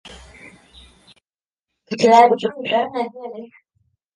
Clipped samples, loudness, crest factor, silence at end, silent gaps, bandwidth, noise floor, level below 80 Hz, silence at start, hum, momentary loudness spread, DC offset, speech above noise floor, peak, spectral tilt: under 0.1%; -16 LUFS; 20 dB; 0.7 s; 1.47-1.51 s, 1.60-1.64 s; 10.5 kHz; under -90 dBFS; -56 dBFS; 0.05 s; none; 22 LU; under 0.1%; over 73 dB; 0 dBFS; -4.5 dB/octave